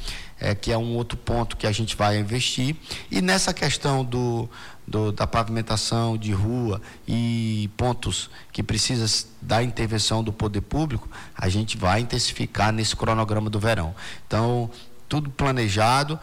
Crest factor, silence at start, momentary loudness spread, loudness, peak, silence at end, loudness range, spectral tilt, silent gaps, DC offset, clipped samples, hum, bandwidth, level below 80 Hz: 14 dB; 0 s; 8 LU; -24 LUFS; -10 dBFS; 0 s; 2 LU; -4.5 dB/octave; none; under 0.1%; under 0.1%; none; 16 kHz; -40 dBFS